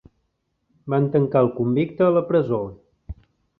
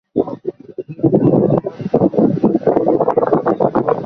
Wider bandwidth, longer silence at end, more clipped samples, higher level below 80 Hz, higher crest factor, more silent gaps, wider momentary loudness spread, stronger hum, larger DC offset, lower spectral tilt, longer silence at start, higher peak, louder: second, 4.2 kHz vs 6 kHz; first, 0.45 s vs 0 s; neither; about the same, -50 dBFS vs -48 dBFS; about the same, 18 dB vs 14 dB; neither; first, 23 LU vs 12 LU; neither; neither; about the same, -11.5 dB/octave vs -11.5 dB/octave; first, 0.85 s vs 0.15 s; second, -4 dBFS vs 0 dBFS; second, -21 LUFS vs -15 LUFS